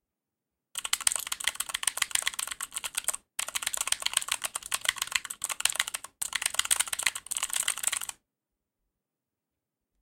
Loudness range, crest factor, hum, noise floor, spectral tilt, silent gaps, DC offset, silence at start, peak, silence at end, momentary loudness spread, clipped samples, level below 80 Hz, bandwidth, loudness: 2 LU; 30 dB; none; -88 dBFS; 3 dB/octave; none; under 0.1%; 0.75 s; -2 dBFS; 1.9 s; 7 LU; under 0.1%; -66 dBFS; 17 kHz; -29 LUFS